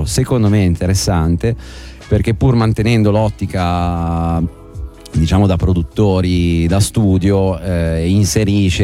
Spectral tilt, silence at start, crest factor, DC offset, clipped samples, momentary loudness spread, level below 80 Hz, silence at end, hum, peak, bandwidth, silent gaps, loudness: -6.5 dB/octave; 0 s; 10 dB; under 0.1%; under 0.1%; 7 LU; -26 dBFS; 0 s; none; -2 dBFS; 15.5 kHz; none; -15 LUFS